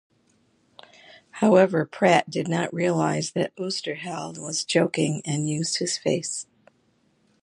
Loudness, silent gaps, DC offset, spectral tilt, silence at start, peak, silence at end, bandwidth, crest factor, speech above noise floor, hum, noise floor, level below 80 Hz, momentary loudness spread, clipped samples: -24 LUFS; none; under 0.1%; -4.5 dB/octave; 1.35 s; -4 dBFS; 1 s; 11.5 kHz; 22 dB; 42 dB; none; -66 dBFS; -70 dBFS; 12 LU; under 0.1%